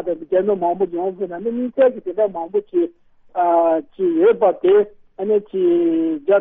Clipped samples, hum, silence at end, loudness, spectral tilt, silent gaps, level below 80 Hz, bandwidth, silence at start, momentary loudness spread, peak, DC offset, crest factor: under 0.1%; none; 0 s; -19 LUFS; -10.5 dB/octave; none; -60 dBFS; 3.8 kHz; 0 s; 9 LU; -4 dBFS; under 0.1%; 14 dB